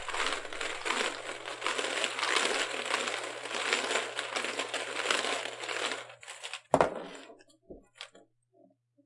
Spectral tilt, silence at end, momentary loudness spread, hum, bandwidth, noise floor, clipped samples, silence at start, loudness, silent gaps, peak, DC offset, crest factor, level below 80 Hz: -1 dB/octave; 0.85 s; 15 LU; none; 11.5 kHz; -66 dBFS; under 0.1%; 0 s; -32 LUFS; none; -6 dBFS; under 0.1%; 28 dB; -64 dBFS